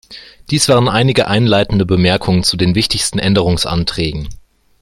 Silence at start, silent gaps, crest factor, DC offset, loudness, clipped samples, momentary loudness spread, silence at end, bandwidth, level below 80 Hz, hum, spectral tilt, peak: 0.1 s; none; 14 dB; under 0.1%; -13 LUFS; under 0.1%; 8 LU; 0.45 s; 14.5 kHz; -34 dBFS; none; -5 dB/octave; 0 dBFS